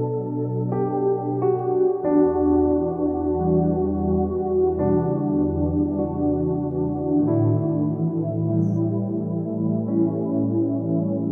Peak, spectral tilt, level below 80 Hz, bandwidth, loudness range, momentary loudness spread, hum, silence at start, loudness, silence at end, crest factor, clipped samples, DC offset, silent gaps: -8 dBFS; -14 dB/octave; -42 dBFS; 2.4 kHz; 2 LU; 5 LU; none; 0 s; -22 LUFS; 0 s; 14 dB; under 0.1%; under 0.1%; none